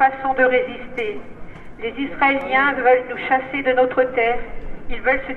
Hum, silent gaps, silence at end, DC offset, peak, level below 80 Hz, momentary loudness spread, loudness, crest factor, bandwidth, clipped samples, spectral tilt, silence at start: none; none; 0 s; under 0.1%; -2 dBFS; -38 dBFS; 15 LU; -19 LUFS; 16 dB; 4.7 kHz; under 0.1%; -6.5 dB/octave; 0 s